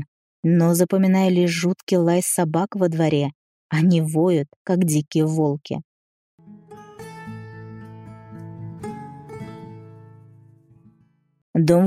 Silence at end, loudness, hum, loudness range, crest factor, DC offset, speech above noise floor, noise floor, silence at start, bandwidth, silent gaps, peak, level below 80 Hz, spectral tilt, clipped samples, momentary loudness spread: 0 s; -20 LUFS; none; 19 LU; 18 dB; under 0.1%; 42 dB; -61 dBFS; 0 s; 15.5 kHz; 0.08-0.43 s, 1.83-1.87 s, 3.35-3.70 s, 4.56-4.65 s, 5.84-6.38 s, 11.42-11.54 s; -4 dBFS; -64 dBFS; -6.5 dB/octave; under 0.1%; 22 LU